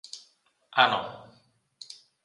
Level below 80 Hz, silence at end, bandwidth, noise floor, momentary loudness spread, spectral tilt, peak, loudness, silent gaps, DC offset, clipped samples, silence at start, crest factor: -74 dBFS; 1 s; 11.5 kHz; -65 dBFS; 25 LU; -2.5 dB/octave; -4 dBFS; -25 LUFS; none; under 0.1%; under 0.1%; 0.15 s; 26 dB